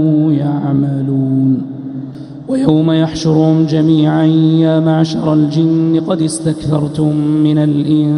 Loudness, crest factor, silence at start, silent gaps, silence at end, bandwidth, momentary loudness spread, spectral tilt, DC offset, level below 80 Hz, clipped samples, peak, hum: -13 LUFS; 12 dB; 0 s; none; 0 s; 11 kHz; 7 LU; -7.5 dB/octave; under 0.1%; -46 dBFS; under 0.1%; 0 dBFS; none